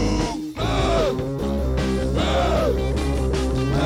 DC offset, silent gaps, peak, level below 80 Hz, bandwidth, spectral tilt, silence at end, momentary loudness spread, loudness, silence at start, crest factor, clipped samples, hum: under 0.1%; none; -10 dBFS; -26 dBFS; 15 kHz; -6 dB/octave; 0 s; 5 LU; -22 LUFS; 0 s; 12 dB; under 0.1%; none